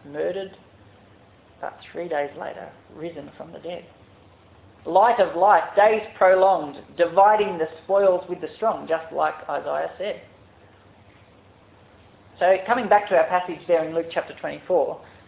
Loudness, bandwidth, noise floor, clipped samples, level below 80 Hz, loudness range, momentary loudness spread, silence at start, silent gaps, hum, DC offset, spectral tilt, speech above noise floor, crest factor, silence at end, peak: -21 LUFS; 4 kHz; -52 dBFS; under 0.1%; -62 dBFS; 15 LU; 19 LU; 0.05 s; none; none; under 0.1%; -8.5 dB/octave; 31 dB; 20 dB; 0.25 s; -4 dBFS